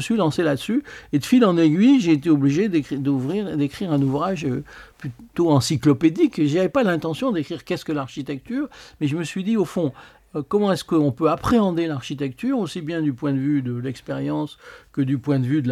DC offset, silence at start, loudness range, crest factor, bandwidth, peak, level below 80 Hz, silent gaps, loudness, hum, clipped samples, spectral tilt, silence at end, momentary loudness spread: under 0.1%; 0 s; 6 LU; 16 dB; 14 kHz; -4 dBFS; -52 dBFS; none; -21 LUFS; none; under 0.1%; -6.5 dB/octave; 0 s; 11 LU